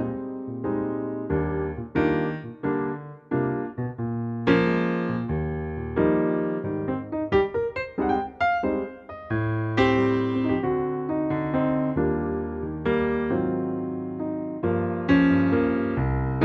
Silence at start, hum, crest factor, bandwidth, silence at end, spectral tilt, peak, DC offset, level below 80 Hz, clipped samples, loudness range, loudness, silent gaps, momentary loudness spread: 0 s; none; 18 dB; 6.8 kHz; 0 s; -9 dB/octave; -6 dBFS; under 0.1%; -42 dBFS; under 0.1%; 3 LU; -25 LUFS; none; 9 LU